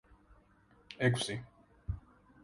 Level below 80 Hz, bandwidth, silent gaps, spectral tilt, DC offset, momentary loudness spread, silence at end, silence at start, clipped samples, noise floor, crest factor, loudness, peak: -54 dBFS; 11.5 kHz; none; -5 dB/octave; under 0.1%; 21 LU; 0.45 s; 0.3 s; under 0.1%; -66 dBFS; 24 dB; -36 LUFS; -16 dBFS